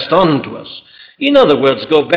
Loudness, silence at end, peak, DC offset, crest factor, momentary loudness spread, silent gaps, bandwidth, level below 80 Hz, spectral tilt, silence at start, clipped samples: -12 LUFS; 0 s; -2 dBFS; under 0.1%; 12 dB; 21 LU; none; 7 kHz; -48 dBFS; -7 dB/octave; 0 s; under 0.1%